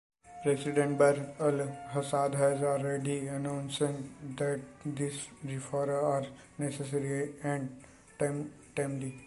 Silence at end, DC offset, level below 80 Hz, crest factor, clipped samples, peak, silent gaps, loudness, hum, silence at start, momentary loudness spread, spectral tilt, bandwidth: 0 s; under 0.1%; -68 dBFS; 20 dB; under 0.1%; -12 dBFS; none; -33 LUFS; none; 0.25 s; 12 LU; -6 dB/octave; 11.5 kHz